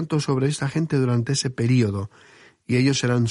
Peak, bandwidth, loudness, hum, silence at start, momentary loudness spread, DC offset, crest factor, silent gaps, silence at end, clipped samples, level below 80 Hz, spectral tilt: -8 dBFS; 11.5 kHz; -22 LUFS; none; 0 s; 5 LU; under 0.1%; 14 dB; none; 0 s; under 0.1%; -58 dBFS; -5.5 dB/octave